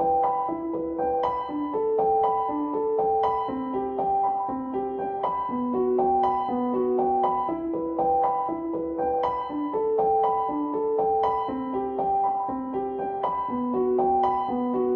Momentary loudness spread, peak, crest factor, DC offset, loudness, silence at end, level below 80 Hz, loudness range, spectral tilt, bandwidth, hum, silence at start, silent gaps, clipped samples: 6 LU; -10 dBFS; 14 dB; under 0.1%; -26 LUFS; 0 s; -56 dBFS; 2 LU; -9 dB/octave; 5.4 kHz; none; 0 s; none; under 0.1%